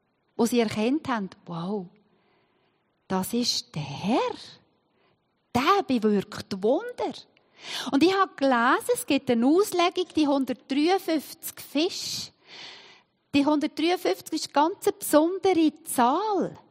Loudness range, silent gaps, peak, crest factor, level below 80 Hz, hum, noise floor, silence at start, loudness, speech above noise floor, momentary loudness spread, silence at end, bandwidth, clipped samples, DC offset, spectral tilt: 7 LU; none; -6 dBFS; 20 dB; -68 dBFS; none; -70 dBFS; 0.4 s; -25 LUFS; 45 dB; 13 LU; 0.1 s; 16 kHz; under 0.1%; under 0.1%; -4 dB/octave